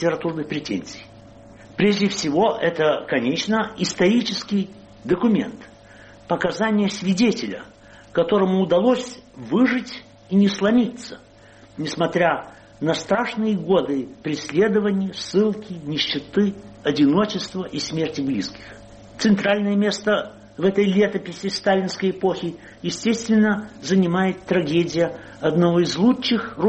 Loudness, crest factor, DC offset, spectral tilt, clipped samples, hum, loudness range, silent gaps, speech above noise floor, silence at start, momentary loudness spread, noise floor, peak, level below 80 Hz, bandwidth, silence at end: -21 LUFS; 14 dB; under 0.1%; -5.5 dB/octave; under 0.1%; none; 2 LU; none; 27 dB; 0 s; 11 LU; -48 dBFS; -6 dBFS; -56 dBFS; 8.4 kHz; 0 s